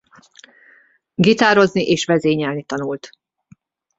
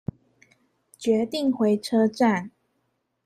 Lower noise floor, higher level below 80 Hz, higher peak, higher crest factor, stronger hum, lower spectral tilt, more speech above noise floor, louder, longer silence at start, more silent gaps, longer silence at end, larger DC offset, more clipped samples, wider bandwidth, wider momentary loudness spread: second, -53 dBFS vs -74 dBFS; first, -58 dBFS vs -64 dBFS; first, -2 dBFS vs -10 dBFS; about the same, 18 dB vs 16 dB; neither; about the same, -5 dB/octave vs -6 dB/octave; second, 37 dB vs 52 dB; first, -17 LUFS vs -23 LUFS; first, 1.2 s vs 1 s; neither; first, 0.9 s vs 0.75 s; neither; neither; second, 8 kHz vs 14 kHz; first, 14 LU vs 11 LU